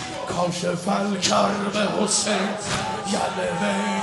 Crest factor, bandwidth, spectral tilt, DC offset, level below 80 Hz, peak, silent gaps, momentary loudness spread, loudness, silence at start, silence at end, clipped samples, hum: 18 dB; 11.5 kHz; -3.5 dB/octave; under 0.1%; -54 dBFS; -6 dBFS; none; 6 LU; -23 LUFS; 0 s; 0 s; under 0.1%; none